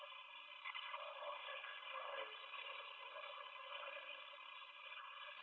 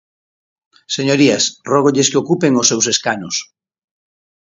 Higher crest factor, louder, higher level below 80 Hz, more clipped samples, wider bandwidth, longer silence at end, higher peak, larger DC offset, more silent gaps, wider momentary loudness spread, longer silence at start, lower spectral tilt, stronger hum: about the same, 18 dB vs 16 dB; second, -51 LUFS vs -14 LUFS; second, under -90 dBFS vs -62 dBFS; neither; second, 6.4 kHz vs 7.8 kHz; second, 0 s vs 1.05 s; second, -36 dBFS vs 0 dBFS; neither; neither; second, 6 LU vs 9 LU; second, 0 s vs 0.9 s; second, 7 dB/octave vs -3 dB/octave; neither